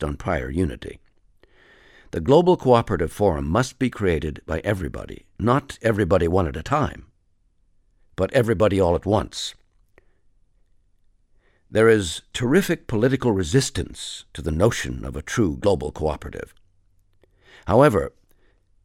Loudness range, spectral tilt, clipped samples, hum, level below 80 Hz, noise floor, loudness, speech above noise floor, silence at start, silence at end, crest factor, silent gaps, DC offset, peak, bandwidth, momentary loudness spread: 4 LU; -6 dB/octave; under 0.1%; none; -40 dBFS; -63 dBFS; -22 LUFS; 42 dB; 0 s; 0.75 s; 22 dB; none; under 0.1%; -2 dBFS; 16 kHz; 15 LU